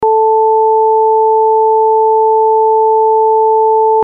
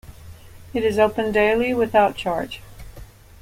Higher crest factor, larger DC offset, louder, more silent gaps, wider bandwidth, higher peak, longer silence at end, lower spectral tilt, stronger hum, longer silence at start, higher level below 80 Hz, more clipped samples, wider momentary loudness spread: second, 4 dB vs 18 dB; neither; first, -10 LUFS vs -20 LUFS; neither; second, 1.3 kHz vs 16.5 kHz; about the same, -4 dBFS vs -4 dBFS; second, 0 s vs 0.35 s; first, -7 dB/octave vs -5.5 dB/octave; neither; about the same, 0 s vs 0.05 s; second, -62 dBFS vs -44 dBFS; neither; second, 0 LU vs 11 LU